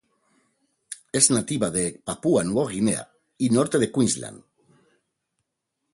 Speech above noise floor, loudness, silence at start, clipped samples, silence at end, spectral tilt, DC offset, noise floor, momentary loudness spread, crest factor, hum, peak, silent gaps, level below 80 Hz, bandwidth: 57 dB; -23 LUFS; 0.9 s; under 0.1%; 1.55 s; -4 dB/octave; under 0.1%; -80 dBFS; 11 LU; 22 dB; none; -2 dBFS; none; -58 dBFS; 12 kHz